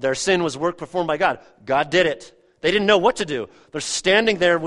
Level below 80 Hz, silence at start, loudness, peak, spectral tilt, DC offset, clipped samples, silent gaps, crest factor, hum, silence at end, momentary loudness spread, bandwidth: -54 dBFS; 0 s; -20 LUFS; -2 dBFS; -3.5 dB/octave; under 0.1%; under 0.1%; none; 18 dB; none; 0 s; 12 LU; 11.5 kHz